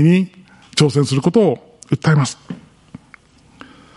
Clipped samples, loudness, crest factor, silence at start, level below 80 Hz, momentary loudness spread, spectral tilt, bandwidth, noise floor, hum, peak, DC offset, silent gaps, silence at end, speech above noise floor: under 0.1%; -17 LUFS; 16 dB; 0 s; -56 dBFS; 16 LU; -6 dB/octave; 11.5 kHz; -48 dBFS; none; 0 dBFS; under 0.1%; none; 1.4 s; 33 dB